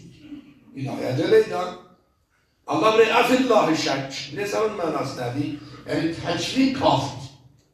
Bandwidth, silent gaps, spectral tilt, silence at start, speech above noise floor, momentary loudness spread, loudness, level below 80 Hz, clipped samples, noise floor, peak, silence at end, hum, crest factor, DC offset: 14 kHz; none; -5 dB/octave; 0.05 s; 44 dB; 22 LU; -22 LUFS; -58 dBFS; under 0.1%; -66 dBFS; -4 dBFS; 0.45 s; none; 18 dB; under 0.1%